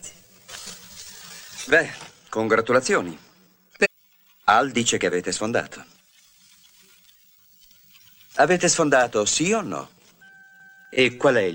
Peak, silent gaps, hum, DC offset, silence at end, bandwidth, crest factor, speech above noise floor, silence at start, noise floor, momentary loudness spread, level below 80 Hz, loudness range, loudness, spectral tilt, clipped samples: -4 dBFS; none; none; under 0.1%; 0 s; 16.5 kHz; 20 dB; 38 dB; 0.05 s; -59 dBFS; 20 LU; -62 dBFS; 6 LU; -21 LUFS; -3 dB/octave; under 0.1%